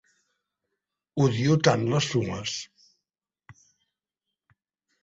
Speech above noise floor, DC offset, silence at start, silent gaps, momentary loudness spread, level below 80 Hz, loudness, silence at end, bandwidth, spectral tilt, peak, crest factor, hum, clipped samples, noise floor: 64 dB; under 0.1%; 1.15 s; none; 14 LU; -60 dBFS; -25 LUFS; 1.5 s; 8 kHz; -5.5 dB/octave; -6 dBFS; 24 dB; none; under 0.1%; -88 dBFS